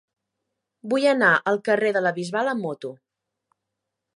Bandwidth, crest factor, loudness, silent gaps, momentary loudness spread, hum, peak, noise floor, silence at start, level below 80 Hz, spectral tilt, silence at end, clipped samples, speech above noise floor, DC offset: 11.5 kHz; 20 dB; -22 LUFS; none; 16 LU; none; -4 dBFS; -83 dBFS; 0.85 s; -78 dBFS; -5 dB/octave; 1.2 s; under 0.1%; 61 dB; under 0.1%